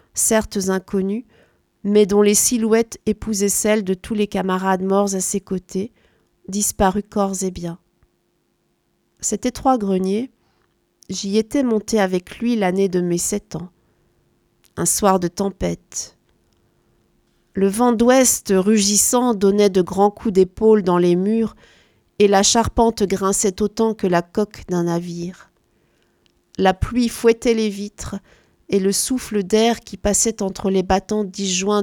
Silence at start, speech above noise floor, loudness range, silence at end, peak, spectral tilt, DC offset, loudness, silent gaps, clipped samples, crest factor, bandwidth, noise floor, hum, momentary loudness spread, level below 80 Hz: 0.15 s; 48 dB; 7 LU; 0 s; 0 dBFS; -4 dB/octave; under 0.1%; -18 LUFS; none; under 0.1%; 20 dB; 19 kHz; -66 dBFS; none; 13 LU; -44 dBFS